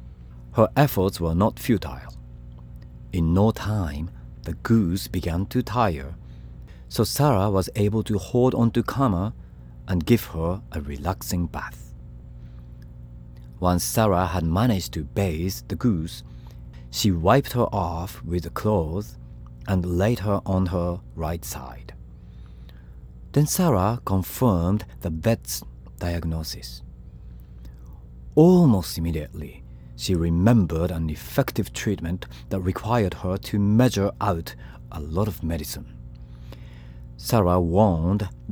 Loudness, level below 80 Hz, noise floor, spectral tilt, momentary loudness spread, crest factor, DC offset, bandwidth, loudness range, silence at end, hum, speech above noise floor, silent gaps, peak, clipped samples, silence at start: -24 LUFS; -40 dBFS; -42 dBFS; -6.5 dB/octave; 23 LU; 20 dB; under 0.1%; over 20 kHz; 5 LU; 0 s; 60 Hz at -45 dBFS; 20 dB; none; -4 dBFS; under 0.1%; 0 s